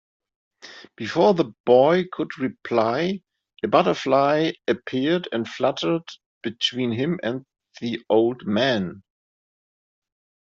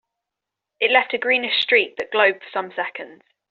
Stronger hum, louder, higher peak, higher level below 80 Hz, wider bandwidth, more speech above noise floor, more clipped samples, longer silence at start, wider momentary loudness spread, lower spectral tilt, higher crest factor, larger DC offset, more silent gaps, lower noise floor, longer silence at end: neither; second, -22 LUFS vs -19 LUFS; about the same, -4 dBFS vs -2 dBFS; first, -66 dBFS vs -74 dBFS; about the same, 7.6 kHz vs 7.2 kHz; first, over 68 dB vs 64 dB; neither; second, 0.65 s vs 0.8 s; about the same, 14 LU vs 12 LU; first, -6 dB/octave vs 2 dB/octave; about the same, 20 dB vs 20 dB; neither; first, 1.60-1.64 s, 6.26-6.41 s vs none; first, under -90 dBFS vs -85 dBFS; first, 1.6 s vs 0.35 s